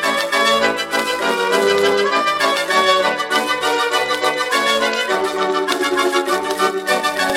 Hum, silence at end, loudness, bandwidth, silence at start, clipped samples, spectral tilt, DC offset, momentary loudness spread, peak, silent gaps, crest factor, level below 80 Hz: none; 0 s; -16 LUFS; 17 kHz; 0 s; under 0.1%; -2 dB/octave; under 0.1%; 4 LU; -2 dBFS; none; 14 dB; -58 dBFS